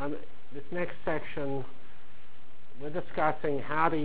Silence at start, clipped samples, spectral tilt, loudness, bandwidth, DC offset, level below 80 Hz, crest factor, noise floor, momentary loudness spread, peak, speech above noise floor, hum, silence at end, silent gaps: 0 s; under 0.1%; -9.5 dB/octave; -33 LUFS; 4 kHz; 4%; -60 dBFS; 24 dB; -58 dBFS; 16 LU; -12 dBFS; 26 dB; none; 0 s; none